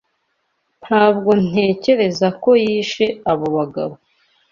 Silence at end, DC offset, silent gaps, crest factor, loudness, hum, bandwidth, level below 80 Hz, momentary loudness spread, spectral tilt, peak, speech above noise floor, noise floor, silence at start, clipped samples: 0.55 s; under 0.1%; none; 16 dB; -17 LUFS; none; 7.4 kHz; -56 dBFS; 7 LU; -6 dB/octave; -2 dBFS; 53 dB; -69 dBFS; 0.85 s; under 0.1%